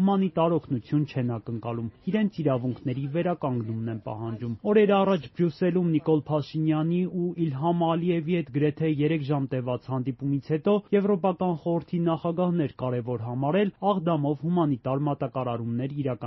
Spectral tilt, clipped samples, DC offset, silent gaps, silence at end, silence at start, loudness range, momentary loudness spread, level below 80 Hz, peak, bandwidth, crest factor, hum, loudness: -7.5 dB/octave; under 0.1%; under 0.1%; none; 0 s; 0 s; 3 LU; 7 LU; -62 dBFS; -10 dBFS; 6 kHz; 16 dB; none; -27 LUFS